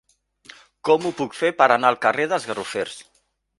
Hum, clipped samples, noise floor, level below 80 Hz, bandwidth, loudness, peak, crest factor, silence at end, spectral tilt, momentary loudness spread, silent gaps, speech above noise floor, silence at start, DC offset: none; under 0.1%; -49 dBFS; -66 dBFS; 11.5 kHz; -21 LUFS; 0 dBFS; 22 dB; 0.55 s; -4 dB/octave; 13 LU; none; 29 dB; 0.85 s; under 0.1%